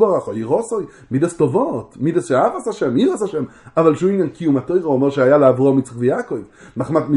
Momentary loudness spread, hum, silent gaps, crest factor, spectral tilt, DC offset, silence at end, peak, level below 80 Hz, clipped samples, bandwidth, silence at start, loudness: 11 LU; none; none; 16 dB; -7.5 dB/octave; under 0.1%; 0 s; 0 dBFS; -56 dBFS; under 0.1%; 11 kHz; 0 s; -18 LUFS